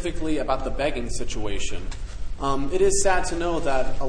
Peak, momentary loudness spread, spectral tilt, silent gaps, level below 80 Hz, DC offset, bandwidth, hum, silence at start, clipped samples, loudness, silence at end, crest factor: -8 dBFS; 12 LU; -4 dB/octave; none; -30 dBFS; under 0.1%; 10 kHz; none; 0 s; under 0.1%; -26 LUFS; 0 s; 14 dB